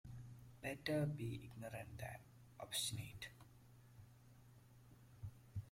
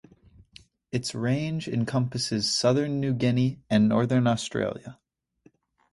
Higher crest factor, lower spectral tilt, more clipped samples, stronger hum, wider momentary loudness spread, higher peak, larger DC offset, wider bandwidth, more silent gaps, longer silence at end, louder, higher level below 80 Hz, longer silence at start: about the same, 22 dB vs 20 dB; about the same, -4.5 dB/octave vs -5.5 dB/octave; neither; neither; first, 24 LU vs 9 LU; second, -28 dBFS vs -8 dBFS; neither; first, 16.5 kHz vs 11.5 kHz; neither; second, 0 s vs 1 s; second, -48 LUFS vs -26 LUFS; second, -70 dBFS vs -58 dBFS; second, 0.05 s vs 0.95 s